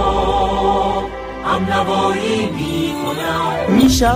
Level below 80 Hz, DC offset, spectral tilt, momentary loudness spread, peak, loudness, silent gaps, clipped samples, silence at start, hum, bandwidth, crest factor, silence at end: -30 dBFS; under 0.1%; -5 dB/octave; 7 LU; -2 dBFS; -17 LUFS; none; under 0.1%; 0 s; none; 16 kHz; 14 dB; 0 s